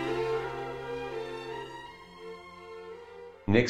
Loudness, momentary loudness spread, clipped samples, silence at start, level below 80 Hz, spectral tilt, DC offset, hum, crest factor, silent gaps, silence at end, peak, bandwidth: -37 LUFS; 15 LU; under 0.1%; 0 s; -58 dBFS; -6.5 dB/octave; under 0.1%; none; 26 dB; none; 0 s; -8 dBFS; 12 kHz